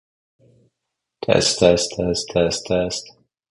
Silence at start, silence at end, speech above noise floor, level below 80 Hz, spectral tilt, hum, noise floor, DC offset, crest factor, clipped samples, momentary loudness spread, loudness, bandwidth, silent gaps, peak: 1.2 s; 0.4 s; 62 dB; -44 dBFS; -3.5 dB/octave; none; -80 dBFS; under 0.1%; 22 dB; under 0.1%; 11 LU; -19 LUFS; 11.5 kHz; none; 0 dBFS